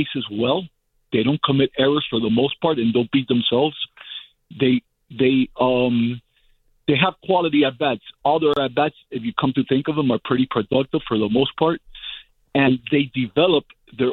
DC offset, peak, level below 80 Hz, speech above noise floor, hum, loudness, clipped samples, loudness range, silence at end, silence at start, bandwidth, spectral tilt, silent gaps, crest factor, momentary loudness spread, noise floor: under 0.1%; -2 dBFS; -54 dBFS; 40 dB; none; -20 LUFS; under 0.1%; 1 LU; 0 s; 0 s; 4.3 kHz; -9 dB/octave; none; 18 dB; 11 LU; -60 dBFS